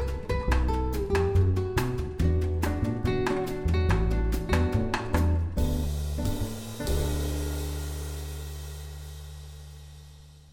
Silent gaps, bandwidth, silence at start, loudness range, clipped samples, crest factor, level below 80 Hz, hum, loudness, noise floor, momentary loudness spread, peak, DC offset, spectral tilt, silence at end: none; 18 kHz; 0 s; 7 LU; under 0.1%; 18 dB; -32 dBFS; none; -29 LUFS; -49 dBFS; 16 LU; -8 dBFS; under 0.1%; -6.5 dB/octave; 0.1 s